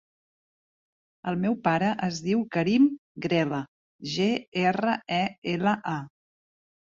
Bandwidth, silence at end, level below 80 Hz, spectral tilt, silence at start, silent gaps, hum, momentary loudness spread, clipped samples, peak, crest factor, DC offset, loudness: 7.6 kHz; 0.85 s; -66 dBFS; -6 dB/octave; 1.25 s; 2.98-3.15 s, 3.68-3.99 s, 4.48-4.52 s, 5.38-5.42 s; none; 11 LU; under 0.1%; -10 dBFS; 18 dB; under 0.1%; -26 LUFS